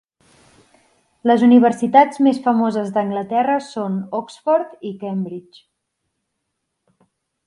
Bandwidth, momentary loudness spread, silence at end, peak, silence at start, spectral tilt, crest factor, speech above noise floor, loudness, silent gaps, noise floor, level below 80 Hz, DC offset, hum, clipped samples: 11 kHz; 14 LU; 2.05 s; 0 dBFS; 1.25 s; -7 dB/octave; 18 dB; 59 dB; -17 LUFS; none; -76 dBFS; -68 dBFS; under 0.1%; none; under 0.1%